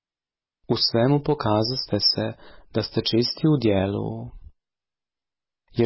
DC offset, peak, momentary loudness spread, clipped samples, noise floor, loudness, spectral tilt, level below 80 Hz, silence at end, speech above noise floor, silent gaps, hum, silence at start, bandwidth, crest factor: under 0.1%; -8 dBFS; 11 LU; under 0.1%; under -90 dBFS; -23 LUFS; -9 dB/octave; -50 dBFS; 0 s; over 67 dB; none; none; 0.7 s; 6 kHz; 16 dB